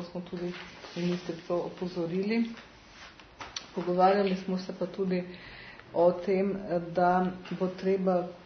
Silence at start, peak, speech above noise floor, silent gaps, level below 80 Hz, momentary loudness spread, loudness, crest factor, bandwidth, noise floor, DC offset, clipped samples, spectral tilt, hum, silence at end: 0 s; -12 dBFS; 22 dB; none; -62 dBFS; 19 LU; -30 LUFS; 20 dB; 6.6 kHz; -51 dBFS; under 0.1%; under 0.1%; -7 dB/octave; none; 0 s